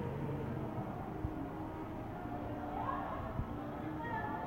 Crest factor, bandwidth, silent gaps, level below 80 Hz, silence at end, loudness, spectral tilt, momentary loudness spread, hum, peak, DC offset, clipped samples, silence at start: 16 dB; 16.5 kHz; none; -52 dBFS; 0 s; -42 LUFS; -8.5 dB/octave; 4 LU; none; -26 dBFS; under 0.1%; under 0.1%; 0 s